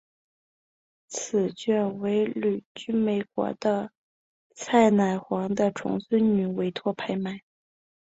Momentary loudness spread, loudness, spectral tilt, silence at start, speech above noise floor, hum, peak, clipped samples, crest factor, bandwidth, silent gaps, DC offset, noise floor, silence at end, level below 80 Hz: 12 LU; -26 LUFS; -6 dB/octave; 1.1 s; over 65 dB; none; -8 dBFS; under 0.1%; 20 dB; 8 kHz; 2.66-2.75 s, 3.97-4.50 s; under 0.1%; under -90 dBFS; 0.6 s; -66 dBFS